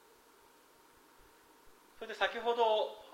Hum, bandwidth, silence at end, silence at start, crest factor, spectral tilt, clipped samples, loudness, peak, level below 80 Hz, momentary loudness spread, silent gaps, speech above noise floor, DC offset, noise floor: none; 16 kHz; 0 s; 1.65 s; 22 dB; -2 dB/octave; under 0.1%; -33 LUFS; -16 dBFS; -74 dBFS; 16 LU; none; 30 dB; under 0.1%; -64 dBFS